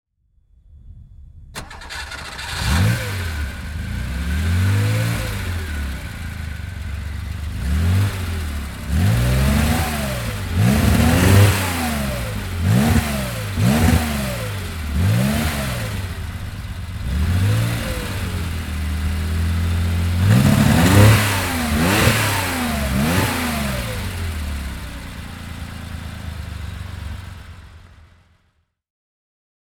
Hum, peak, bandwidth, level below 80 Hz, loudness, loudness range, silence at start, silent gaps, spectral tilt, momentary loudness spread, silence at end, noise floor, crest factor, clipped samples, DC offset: none; 0 dBFS; 19.5 kHz; -28 dBFS; -20 LUFS; 14 LU; 0.7 s; none; -5.5 dB/octave; 16 LU; 2 s; -65 dBFS; 20 dB; under 0.1%; under 0.1%